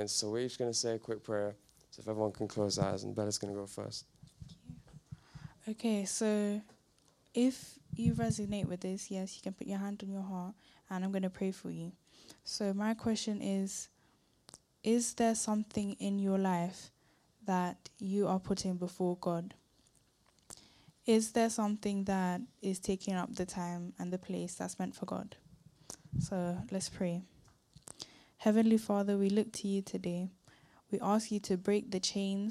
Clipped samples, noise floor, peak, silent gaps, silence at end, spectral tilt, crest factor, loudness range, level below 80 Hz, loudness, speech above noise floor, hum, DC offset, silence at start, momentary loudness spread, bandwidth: under 0.1%; -71 dBFS; -16 dBFS; none; 0 s; -5 dB/octave; 20 dB; 6 LU; -64 dBFS; -36 LUFS; 36 dB; none; under 0.1%; 0 s; 16 LU; 14 kHz